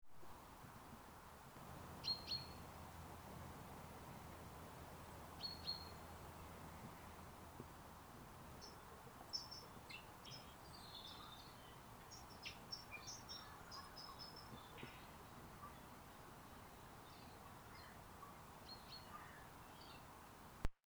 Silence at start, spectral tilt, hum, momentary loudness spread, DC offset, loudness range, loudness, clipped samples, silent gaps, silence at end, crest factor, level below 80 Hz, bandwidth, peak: 0 s; -3.5 dB/octave; none; 11 LU; under 0.1%; 7 LU; -55 LUFS; under 0.1%; none; 0.15 s; 28 dB; -64 dBFS; over 20 kHz; -26 dBFS